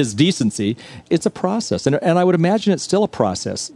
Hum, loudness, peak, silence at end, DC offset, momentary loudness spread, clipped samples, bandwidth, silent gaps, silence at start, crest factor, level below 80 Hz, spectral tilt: none; -18 LUFS; -2 dBFS; 0.05 s; under 0.1%; 7 LU; under 0.1%; 11.5 kHz; none; 0 s; 16 dB; -58 dBFS; -5.5 dB/octave